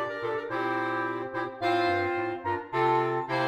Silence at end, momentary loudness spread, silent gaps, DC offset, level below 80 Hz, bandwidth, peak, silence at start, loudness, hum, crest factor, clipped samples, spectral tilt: 0 s; 7 LU; none; under 0.1%; -72 dBFS; 10 kHz; -12 dBFS; 0 s; -29 LUFS; none; 16 dB; under 0.1%; -6.5 dB/octave